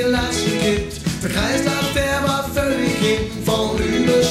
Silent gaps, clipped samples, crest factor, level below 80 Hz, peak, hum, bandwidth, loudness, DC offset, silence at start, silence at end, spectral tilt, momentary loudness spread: none; under 0.1%; 14 dB; -34 dBFS; -6 dBFS; none; 16 kHz; -19 LUFS; under 0.1%; 0 s; 0 s; -4.5 dB/octave; 3 LU